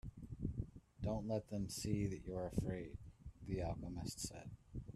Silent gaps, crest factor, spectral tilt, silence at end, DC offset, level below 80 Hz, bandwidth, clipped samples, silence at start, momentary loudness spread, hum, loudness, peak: none; 20 dB; -6 dB/octave; 0 s; under 0.1%; -56 dBFS; 14 kHz; under 0.1%; 0.05 s; 12 LU; none; -45 LUFS; -24 dBFS